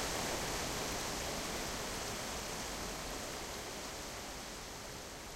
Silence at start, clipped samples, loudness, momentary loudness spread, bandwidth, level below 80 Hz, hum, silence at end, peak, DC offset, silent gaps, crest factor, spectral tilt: 0 s; under 0.1%; -40 LUFS; 8 LU; 16 kHz; -52 dBFS; none; 0 s; -26 dBFS; under 0.1%; none; 16 dB; -2.5 dB/octave